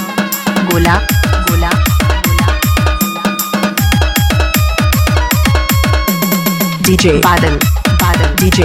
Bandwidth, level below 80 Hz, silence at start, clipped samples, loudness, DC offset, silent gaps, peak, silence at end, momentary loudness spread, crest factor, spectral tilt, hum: 17.5 kHz; -18 dBFS; 0 s; under 0.1%; -11 LUFS; under 0.1%; none; 0 dBFS; 0 s; 4 LU; 10 dB; -4.5 dB/octave; none